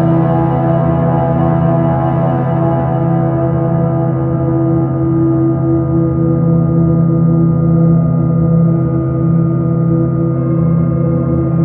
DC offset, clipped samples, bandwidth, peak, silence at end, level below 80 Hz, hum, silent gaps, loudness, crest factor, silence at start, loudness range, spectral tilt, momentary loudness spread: under 0.1%; under 0.1%; 3.1 kHz; 0 dBFS; 0 s; -32 dBFS; none; none; -13 LUFS; 10 dB; 0 s; 2 LU; -13.5 dB/octave; 3 LU